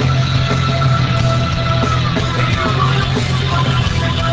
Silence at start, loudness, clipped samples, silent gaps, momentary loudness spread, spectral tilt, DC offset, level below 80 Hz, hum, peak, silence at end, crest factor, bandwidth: 0 s; -15 LUFS; under 0.1%; none; 2 LU; -6 dB/octave; under 0.1%; -26 dBFS; none; -2 dBFS; 0 s; 12 dB; 8 kHz